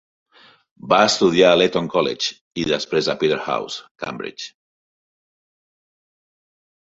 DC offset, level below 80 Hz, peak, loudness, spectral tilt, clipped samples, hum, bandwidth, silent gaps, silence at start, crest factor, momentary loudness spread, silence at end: under 0.1%; -58 dBFS; -2 dBFS; -19 LUFS; -4 dB/octave; under 0.1%; none; 8 kHz; 2.41-2.51 s, 3.91-3.95 s; 0.85 s; 20 dB; 17 LU; 2.45 s